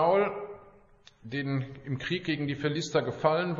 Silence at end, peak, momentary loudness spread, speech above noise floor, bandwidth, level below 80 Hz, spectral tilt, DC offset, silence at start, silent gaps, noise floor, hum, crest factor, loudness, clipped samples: 0 s; -10 dBFS; 14 LU; 29 dB; 7.8 kHz; -62 dBFS; -6 dB/octave; under 0.1%; 0 s; none; -58 dBFS; none; 20 dB; -30 LUFS; under 0.1%